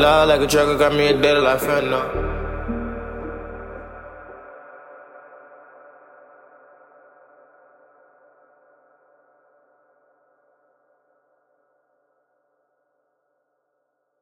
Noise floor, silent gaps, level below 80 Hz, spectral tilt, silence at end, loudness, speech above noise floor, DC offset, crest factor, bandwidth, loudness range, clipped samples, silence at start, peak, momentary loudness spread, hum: -73 dBFS; none; -40 dBFS; -4.5 dB/octave; 8.85 s; -19 LUFS; 56 dB; under 0.1%; 22 dB; 16.5 kHz; 28 LU; under 0.1%; 0 s; -4 dBFS; 27 LU; none